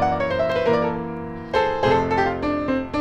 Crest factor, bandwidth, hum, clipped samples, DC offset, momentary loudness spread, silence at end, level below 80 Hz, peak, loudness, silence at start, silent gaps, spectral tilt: 14 dB; 9.4 kHz; none; under 0.1%; under 0.1%; 7 LU; 0 s; -42 dBFS; -6 dBFS; -22 LUFS; 0 s; none; -7 dB/octave